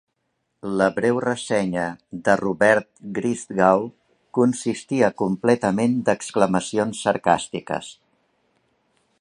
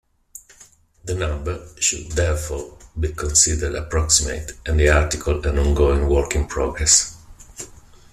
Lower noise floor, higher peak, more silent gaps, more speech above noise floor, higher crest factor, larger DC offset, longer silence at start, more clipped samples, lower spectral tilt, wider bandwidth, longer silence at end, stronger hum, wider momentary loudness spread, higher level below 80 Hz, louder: first, -74 dBFS vs -51 dBFS; about the same, -2 dBFS vs 0 dBFS; neither; first, 53 dB vs 31 dB; about the same, 20 dB vs 20 dB; neither; first, 0.65 s vs 0.35 s; neither; first, -5.5 dB/octave vs -3.5 dB/octave; second, 11.5 kHz vs 14 kHz; first, 1.3 s vs 0.45 s; neither; second, 10 LU vs 17 LU; second, -60 dBFS vs -28 dBFS; second, -22 LUFS vs -19 LUFS